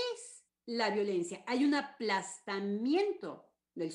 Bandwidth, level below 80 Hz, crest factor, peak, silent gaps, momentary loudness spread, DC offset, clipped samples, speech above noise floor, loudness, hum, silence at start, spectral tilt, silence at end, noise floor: 11 kHz; -86 dBFS; 16 dB; -18 dBFS; none; 17 LU; under 0.1%; under 0.1%; 20 dB; -34 LUFS; none; 0 s; -4.5 dB/octave; 0 s; -54 dBFS